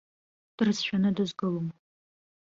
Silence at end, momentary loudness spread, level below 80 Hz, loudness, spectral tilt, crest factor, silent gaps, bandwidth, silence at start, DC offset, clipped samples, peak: 0.7 s; 7 LU; -66 dBFS; -29 LUFS; -6 dB/octave; 18 dB; none; 7.6 kHz; 0.6 s; under 0.1%; under 0.1%; -12 dBFS